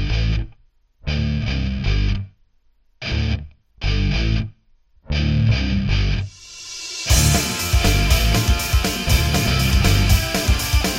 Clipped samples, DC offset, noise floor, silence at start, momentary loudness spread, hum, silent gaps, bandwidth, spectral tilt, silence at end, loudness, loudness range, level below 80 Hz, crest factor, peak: under 0.1%; under 0.1%; -58 dBFS; 0 s; 12 LU; none; none; 16.5 kHz; -4 dB/octave; 0 s; -20 LUFS; 7 LU; -22 dBFS; 18 dB; -2 dBFS